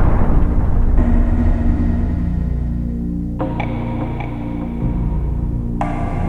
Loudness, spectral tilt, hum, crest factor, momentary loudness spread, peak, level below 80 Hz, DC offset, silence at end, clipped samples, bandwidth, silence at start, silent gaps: -20 LUFS; -10 dB/octave; none; 14 dB; 6 LU; -2 dBFS; -18 dBFS; under 0.1%; 0 s; under 0.1%; 3.9 kHz; 0 s; none